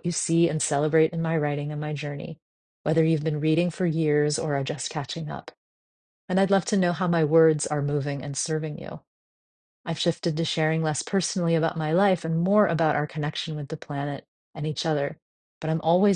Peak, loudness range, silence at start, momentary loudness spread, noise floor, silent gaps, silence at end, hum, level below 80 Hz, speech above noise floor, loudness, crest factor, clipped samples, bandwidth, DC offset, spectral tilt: -8 dBFS; 4 LU; 0.05 s; 11 LU; under -90 dBFS; 2.42-2.84 s, 5.57-6.28 s, 9.07-9.84 s, 14.28-14.53 s, 15.22-15.61 s; 0 s; none; -62 dBFS; over 66 dB; -25 LUFS; 18 dB; under 0.1%; 10 kHz; under 0.1%; -5.5 dB/octave